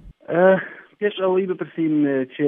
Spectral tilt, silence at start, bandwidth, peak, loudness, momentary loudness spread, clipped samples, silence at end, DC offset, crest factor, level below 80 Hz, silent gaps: -10.5 dB/octave; 0.05 s; 3.8 kHz; -4 dBFS; -20 LUFS; 9 LU; under 0.1%; 0 s; under 0.1%; 16 dB; -56 dBFS; none